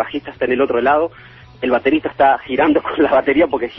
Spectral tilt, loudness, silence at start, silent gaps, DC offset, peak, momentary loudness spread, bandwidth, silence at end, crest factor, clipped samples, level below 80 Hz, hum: -8.5 dB/octave; -16 LUFS; 0 s; none; under 0.1%; -2 dBFS; 8 LU; 5.8 kHz; 0 s; 14 dB; under 0.1%; -48 dBFS; none